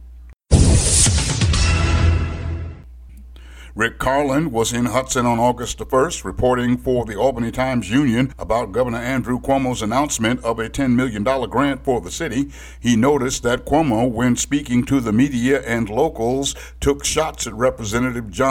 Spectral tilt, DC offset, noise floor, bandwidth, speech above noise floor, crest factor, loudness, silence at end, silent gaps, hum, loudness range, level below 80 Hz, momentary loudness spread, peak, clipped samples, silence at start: -5 dB/octave; under 0.1%; -40 dBFS; 16.5 kHz; 21 dB; 18 dB; -19 LUFS; 0 s; none; none; 3 LU; -28 dBFS; 7 LU; 0 dBFS; under 0.1%; 0 s